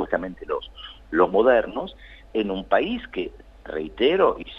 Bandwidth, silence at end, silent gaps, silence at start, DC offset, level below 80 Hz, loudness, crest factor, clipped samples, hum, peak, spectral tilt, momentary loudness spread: 5.6 kHz; 0 s; none; 0 s; under 0.1%; -48 dBFS; -23 LUFS; 20 dB; under 0.1%; none; -4 dBFS; -7.5 dB/octave; 15 LU